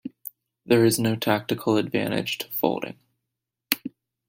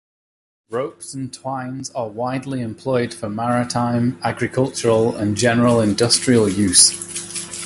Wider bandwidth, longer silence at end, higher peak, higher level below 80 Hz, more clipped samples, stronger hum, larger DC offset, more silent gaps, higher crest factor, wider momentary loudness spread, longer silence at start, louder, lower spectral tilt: about the same, 16.5 kHz vs 16 kHz; first, 0.4 s vs 0 s; about the same, 0 dBFS vs 0 dBFS; second, -64 dBFS vs -50 dBFS; neither; neither; neither; neither; first, 26 dB vs 20 dB; first, 18 LU vs 13 LU; second, 0.05 s vs 0.7 s; second, -24 LUFS vs -18 LUFS; about the same, -5 dB/octave vs -4 dB/octave